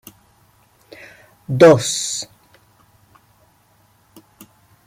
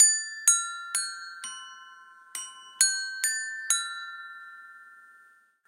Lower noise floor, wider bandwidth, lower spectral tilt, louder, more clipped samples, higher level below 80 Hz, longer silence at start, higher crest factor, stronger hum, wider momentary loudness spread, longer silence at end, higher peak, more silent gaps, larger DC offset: about the same, -57 dBFS vs -59 dBFS; about the same, 16 kHz vs 16 kHz; first, -4.5 dB/octave vs 6.5 dB/octave; first, -15 LUFS vs -26 LUFS; neither; first, -60 dBFS vs under -90 dBFS; first, 1.5 s vs 0 s; about the same, 20 dB vs 24 dB; neither; first, 30 LU vs 23 LU; first, 2.65 s vs 0.7 s; first, -2 dBFS vs -6 dBFS; neither; neither